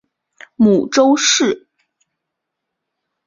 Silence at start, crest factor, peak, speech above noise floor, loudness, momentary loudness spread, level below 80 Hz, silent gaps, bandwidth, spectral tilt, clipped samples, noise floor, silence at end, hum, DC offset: 0.6 s; 16 dB; -2 dBFS; 65 dB; -13 LUFS; 7 LU; -60 dBFS; none; 7.6 kHz; -3 dB/octave; under 0.1%; -78 dBFS; 1.7 s; none; under 0.1%